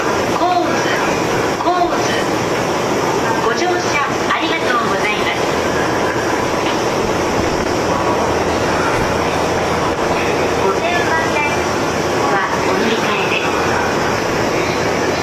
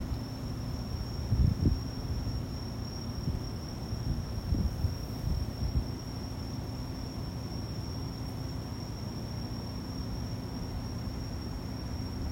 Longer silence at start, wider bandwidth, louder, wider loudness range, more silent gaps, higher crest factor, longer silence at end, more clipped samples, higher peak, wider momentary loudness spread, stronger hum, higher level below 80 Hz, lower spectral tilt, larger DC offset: about the same, 0 s vs 0 s; second, 14 kHz vs 16 kHz; first, -16 LUFS vs -36 LUFS; second, 1 LU vs 4 LU; neither; second, 12 dB vs 20 dB; about the same, 0 s vs 0 s; neither; first, -4 dBFS vs -14 dBFS; second, 2 LU vs 7 LU; neither; about the same, -38 dBFS vs -40 dBFS; second, -4 dB/octave vs -6.5 dB/octave; neither